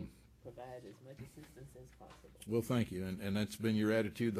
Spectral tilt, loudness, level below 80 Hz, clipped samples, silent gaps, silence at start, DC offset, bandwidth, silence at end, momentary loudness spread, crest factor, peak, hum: -6.5 dB/octave; -37 LUFS; -66 dBFS; under 0.1%; none; 0 s; under 0.1%; 15 kHz; 0 s; 23 LU; 18 dB; -22 dBFS; none